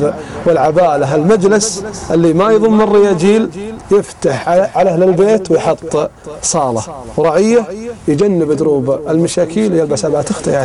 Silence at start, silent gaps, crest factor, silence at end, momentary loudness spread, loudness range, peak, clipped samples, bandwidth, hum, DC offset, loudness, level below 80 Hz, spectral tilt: 0 s; none; 12 dB; 0 s; 8 LU; 3 LU; 0 dBFS; under 0.1%; 12 kHz; none; under 0.1%; -12 LUFS; -42 dBFS; -5.5 dB/octave